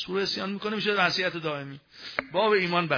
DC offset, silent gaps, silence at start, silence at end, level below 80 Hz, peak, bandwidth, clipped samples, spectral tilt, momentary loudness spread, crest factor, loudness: under 0.1%; none; 0 s; 0 s; -68 dBFS; -8 dBFS; 5.4 kHz; under 0.1%; -5 dB/octave; 12 LU; 20 dB; -26 LUFS